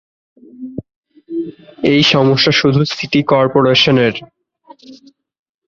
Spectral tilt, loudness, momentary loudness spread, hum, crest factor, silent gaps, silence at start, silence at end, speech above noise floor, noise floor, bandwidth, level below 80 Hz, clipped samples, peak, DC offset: -5.5 dB/octave; -12 LUFS; 19 LU; none; 16 dB; 0.96-1.03 s; 0.6 s; 0.75 s; 31 dB; -44 dBFS; 7.4 kHz; -50 dBFS; under 0.1%; 0 dBFS; under 0.1%